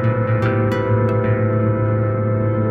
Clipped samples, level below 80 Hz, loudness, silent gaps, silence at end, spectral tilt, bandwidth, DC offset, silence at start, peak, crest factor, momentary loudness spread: under 0.1%; -40 dBFS; -18 LUFS; none; 0 s; -10 dB/octave; 4.7 kHz; under 0.1%; 0 s; -6 dBFS; 12 dB; 1 LU